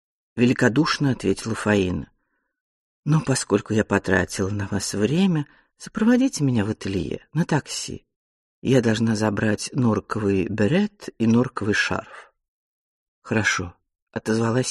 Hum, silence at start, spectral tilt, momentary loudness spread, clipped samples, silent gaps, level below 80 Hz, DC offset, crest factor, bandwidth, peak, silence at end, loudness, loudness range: none; 0.35 s; -5.5 dB/octave; 11 LU; under 0.1%; 2.61-3.03 s, 8.16-8.62 s, 12.48-13.22 s, 14.02-14.07 s; -52 dBFS; under 0.1%; 18 dB; 12.5 kHz; -4 dBFS; 0 s; -22 LUFS; 2 LU